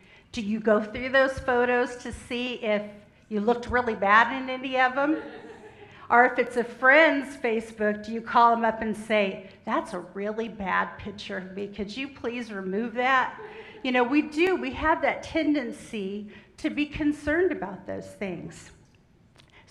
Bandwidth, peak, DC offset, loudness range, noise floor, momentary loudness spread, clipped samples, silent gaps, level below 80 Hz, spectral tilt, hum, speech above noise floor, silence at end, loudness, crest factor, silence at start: 12 kHz; -4 dBFS; under 0.1%; 8 LU; -59 dBFS; 15 LU; under 0.1%; none; -52 dBFS; -5 dB/octave; none; 33 dB; 1 s; -25 LUFS; 22 dB; 0.35 s